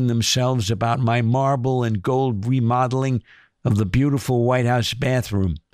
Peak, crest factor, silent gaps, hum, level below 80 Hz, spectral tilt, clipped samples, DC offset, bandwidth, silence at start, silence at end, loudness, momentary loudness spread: -8 dBFS; 12 dB; none; none; -42 dBFS; -6 dB/octave; under 0.1%; under 0.1%; 15.5 kHz; 0 s; 0.15 s; -21 LUFS; 4 LU